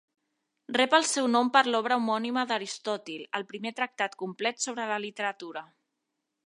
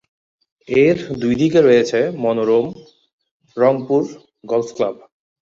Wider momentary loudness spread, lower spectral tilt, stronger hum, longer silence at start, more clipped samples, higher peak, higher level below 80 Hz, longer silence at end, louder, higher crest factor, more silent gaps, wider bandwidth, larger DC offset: about the same, 12 LU vs 10 LU; second, -2 dB/octave vs -6.5 dB/octave; neither; about the same, 0.7 s vs 0.7 s; neither; second, -6 dBFS vs -2 dBFS; second, -84 dBFS vs -54 dBFS; first, 0.85 s vs 0.5 s; second, -28 LUFS vs -17 LUFS; first, 24 dB vs 16 dB; second, none vs 3.13-3.19 s, 3.31-3.40 s; first, 11.5 kHz vs 7.6 kHz; neither